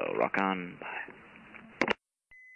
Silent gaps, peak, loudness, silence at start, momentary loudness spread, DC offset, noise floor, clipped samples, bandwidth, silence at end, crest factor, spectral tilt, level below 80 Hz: none; -12 dBFS; -33 LUFS; 0 s; 21 LU; under 0.1%; -60 dBFS; under 0.1%; 10 kHz; 0 s; 24 dB; -5.5 dB/octave; -70 dBFS